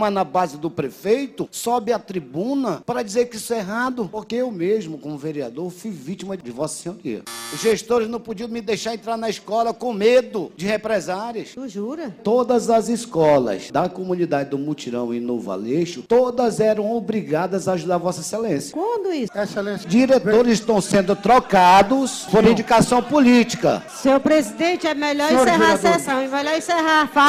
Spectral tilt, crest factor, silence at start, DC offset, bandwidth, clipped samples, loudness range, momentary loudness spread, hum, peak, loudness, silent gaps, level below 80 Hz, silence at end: -5 dB/octave; 14 dB; 0 s; under 0.1%; 15.5 kHz; under 0.1%; 10 LU; 13 LU; none; -4 dBFS; -20 LUFS; none; -52 dBFS; 0 s